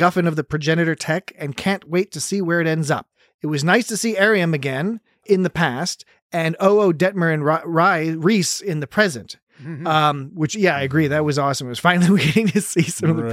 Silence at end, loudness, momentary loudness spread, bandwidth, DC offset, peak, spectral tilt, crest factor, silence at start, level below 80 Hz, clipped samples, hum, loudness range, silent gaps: 0 s; -19 LUFS; 9 LU; 16 kHz; under 0.1%; -2 dBFS; -5 dB/octave; 18 dB; 0 s; -56 dBFS; under 0.1%; none; 3 LU; 3.34-3.39 s, 6.22-6.30 s, 9.43-9.47 s